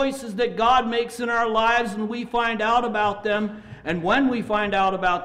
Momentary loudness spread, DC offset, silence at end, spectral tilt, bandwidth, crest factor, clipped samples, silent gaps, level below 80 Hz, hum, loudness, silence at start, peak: 7 LU; under 0.1%; 0 s; -5 dB/octave; 15 kHz; 12 dB; under 0.1%; none; -48 dBFS; none; -22 LUFS; 0 s; -10 dBFS